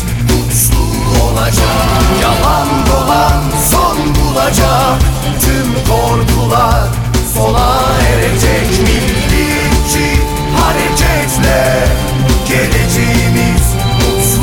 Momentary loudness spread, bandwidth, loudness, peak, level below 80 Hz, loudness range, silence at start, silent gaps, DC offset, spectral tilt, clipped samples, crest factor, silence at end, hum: 3 LU; 19.5 kHz; -11 LUFS; 0 dBFS; -16 dBFS; 1 LU; 0 s; none; under 0.1%; -4.5 dB/octave; under 0.1%; 10 dB; 0 s; none